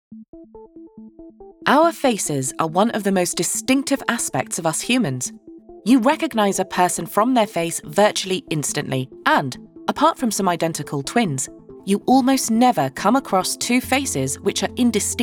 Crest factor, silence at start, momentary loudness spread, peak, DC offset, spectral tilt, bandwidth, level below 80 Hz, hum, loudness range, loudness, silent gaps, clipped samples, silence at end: 20 dB; 0.1 s; 8 LU; -2 dBFS; under 0.1%; -4 dB/octave; 19 kHz; -56 dBFS; none; 2 LU; -20 LUFS; 0.28-0.33 s; under 0.1%; 0 s